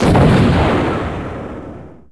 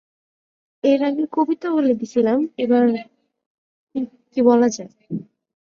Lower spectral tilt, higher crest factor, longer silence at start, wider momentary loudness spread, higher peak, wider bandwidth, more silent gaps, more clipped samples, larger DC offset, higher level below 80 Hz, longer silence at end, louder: first, -7.5 dB/octave vs -6 dB/octave; about the same, 14 dB vs 18 dB; second, 0 s vs 0.85 s; first, 19 LU vs 15 LU; about the same, -2 dBFS vs -2 dBFS; first, 11 kHz vs 7.2 kHz; second, none vs 3.46-3.87 s; neither; first, 0.7% vs under 0.1%; first, -26 dBFS vs -68 dBFS; second, 0.15 s vs 0.4 s; first, -14 LUFS vs -19 LUFS